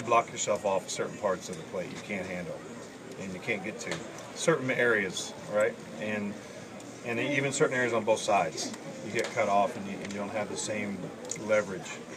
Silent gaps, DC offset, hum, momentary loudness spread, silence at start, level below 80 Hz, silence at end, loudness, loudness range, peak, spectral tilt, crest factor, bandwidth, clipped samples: none; under 0.1%; none; 14 LU; 0 s; -72 dBFS; 0 s; -31 LUFS; 5 LU; -10 dBFS; -4 dB/octave; 22 dB; 15.5 kHz; under 0.1%